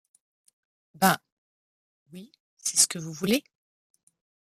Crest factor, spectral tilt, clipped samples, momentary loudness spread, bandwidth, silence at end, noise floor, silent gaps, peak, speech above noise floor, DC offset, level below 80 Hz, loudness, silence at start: 28 dB; -2.5 dB/octave; under 0.1%; 26 LU; 15 kHz; 1.05 s; under -90 dBFS; 1.32-2.06 s, 2.40-2.57 s; -4 dBFS; over 65 dB; under 0.1%; -72 dBFS; -25 LUFS; 1 s